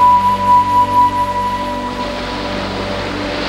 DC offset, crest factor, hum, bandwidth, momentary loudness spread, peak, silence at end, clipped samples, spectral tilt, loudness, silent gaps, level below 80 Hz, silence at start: under 0.1%; 12 dB; none; 13 kHz; 10 LU; -2 dBFS; 0 s; under 0.1%; -5 dB/octave; -15 LUFS; none; -34 dBFS; 0 s